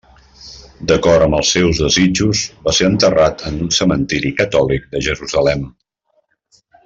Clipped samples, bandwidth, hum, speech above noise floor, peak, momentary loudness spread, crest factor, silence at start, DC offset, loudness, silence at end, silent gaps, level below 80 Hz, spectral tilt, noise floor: under 0.1%; 8 kHz; none; 49 dB; -2 dBFS; 10 LU; 14 dB; 0.4 s; under 0.1%; -14 LUFS; 1.15 s; none; -36 dBFS; -4 dB/octave; -63 dBFS